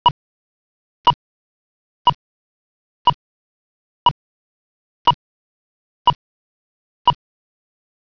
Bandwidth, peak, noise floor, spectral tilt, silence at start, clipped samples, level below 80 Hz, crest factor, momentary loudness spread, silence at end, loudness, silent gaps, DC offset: 5.4 kHz; -4 dBFS; under -90 dBFS; -1.5 dB/octave; 0.05 s; under 0.1%; -52 dBFS; 20 dB; 11 LU; 0.9 s; -20 LUFS; 0.11-1.04 s, 1.14-2.05 s, 2.15-3.05 s, 3.14-5.05 s, 5.14-6.05 s, 6.15-7.05 s; under 0.1%